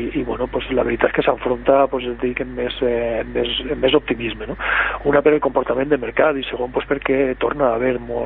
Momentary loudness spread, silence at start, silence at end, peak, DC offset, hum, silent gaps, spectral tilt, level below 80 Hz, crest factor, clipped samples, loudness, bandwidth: 7 LU; 0 s; 0 s; -2 dBFS; under 0.1%; none; none; -10.5 dB/octave; -38 dBFS; 18 dB; under 0.1%; -19 LUFS; 4.1 kHz